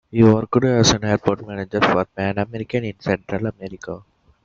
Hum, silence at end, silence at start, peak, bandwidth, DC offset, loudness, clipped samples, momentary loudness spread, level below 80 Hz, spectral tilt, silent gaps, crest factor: none; 0.45 s; 0.15 s; 0 dBFS; 7.8 kHz; under 0.1%; -19 LUFS; under 0.1%; 17 LU; -46 dBFS; -5 dB/octave; none; 20 dB